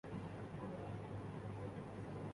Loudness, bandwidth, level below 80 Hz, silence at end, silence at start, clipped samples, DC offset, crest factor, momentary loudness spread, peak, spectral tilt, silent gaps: -49 LUFS; 11.5 kHz; -64 dBFS; 0 s; 0.05 s; under 0.1%; under 0.1%; 12 dB; 1 LU; -36 dBFS; -8 dB/octave; none